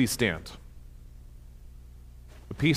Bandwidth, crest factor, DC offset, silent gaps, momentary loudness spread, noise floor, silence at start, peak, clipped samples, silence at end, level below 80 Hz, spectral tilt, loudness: 16 kHz; 22 dB; under 0.1%; none; 24 LU; -48 dBFS; 0 s; -10 dBFS; under 0.1%; 0 s; -48 dBFS; -4.5 dB/octave; -29 LUFS